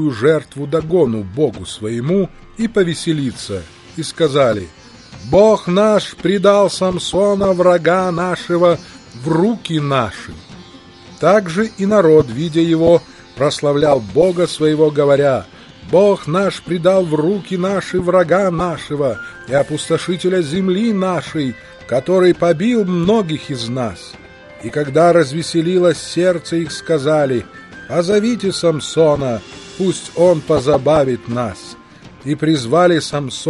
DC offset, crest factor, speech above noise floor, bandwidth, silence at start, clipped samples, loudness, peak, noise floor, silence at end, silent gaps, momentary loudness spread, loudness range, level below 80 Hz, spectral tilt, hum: under 0.1%; 16 dB; 25 dB; 11.5 kHz; 0 s; under 0.1%; -15 LUFS; 0 dBFS; -40 dBFS; 0 s; none; 11 LU; 4 LU; -46 dBFS; -6 dB/octave; none